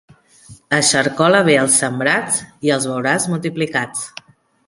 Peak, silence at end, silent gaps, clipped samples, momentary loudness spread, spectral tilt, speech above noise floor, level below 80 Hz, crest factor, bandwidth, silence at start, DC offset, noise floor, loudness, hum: -2 dBFS; 0.6 s; none; under 0.1%; 8 LU; -3 dB/octave; 28 dB; -58 dBFS; 16 dB; 11.5 kHz; 0.5 s; under 0.1%; -44 dBFS; -16 LUFS; none